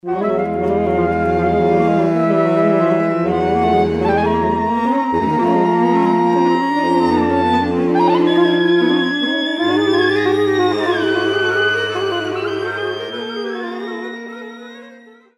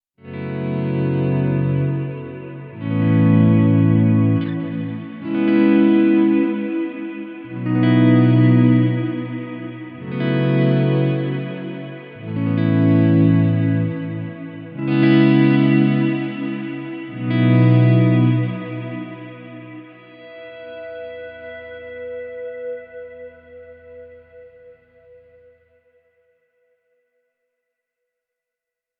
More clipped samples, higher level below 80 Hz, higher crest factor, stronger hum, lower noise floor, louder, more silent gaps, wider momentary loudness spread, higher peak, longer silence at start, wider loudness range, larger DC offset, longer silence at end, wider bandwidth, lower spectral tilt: neither; first, -44 dBFS vs -62 dBFS; about the same, 14 dB vs 16 dB; neither; second, -43 dBFS vs -85 dBFS; about the same, -16 LUFS vs -17 LUFS; neither; second, 10 LU vs 20 LU; about the same, -2 dBFS vs -2 dBFS; second, 0.05 s vs 0.25 s; second, 5 LU vs 17 LU; neither; second, 0.4 s vs 4.3 s; first, 10 kHz vs 5 kHz; second, -6.5 dB/octave vs -12.5 dB/octave